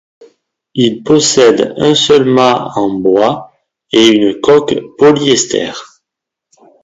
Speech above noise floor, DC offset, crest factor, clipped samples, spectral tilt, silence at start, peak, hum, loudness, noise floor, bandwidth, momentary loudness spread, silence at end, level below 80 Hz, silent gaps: 70 dB; under 0.1%; 12 dB; 0.2%; -4 dB/octave; 0.75 s; 0 dBFS; none; -10 LUFS; -80 dBFS; 8 kHz; 9 LU; 1 s; -50 dBFS; none